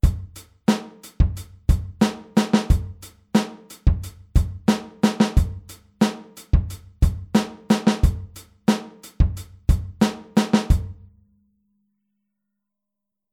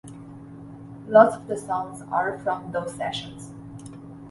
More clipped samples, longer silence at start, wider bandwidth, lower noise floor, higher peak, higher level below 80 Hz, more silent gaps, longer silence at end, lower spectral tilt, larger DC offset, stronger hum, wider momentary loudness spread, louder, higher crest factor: neither; about the same, 0.05 s vs 0.05 s; first, 16 kHz vs 11.5 kHz; first, -85 dBFS vs -41 dBFS; about the same, -4 dBFS vs -2 dBFS; first, -26 dBFS vs -58 dBFS; neither; first, 2.4 s vs 0 s; about the same, -6.5 dB/octave vs -5.5 dB/octave; neither; neither; second, 15 LU vs 25 LU; about the same, -23 LUFS vs -23 LUFS; second, 18 dB vs 24 dB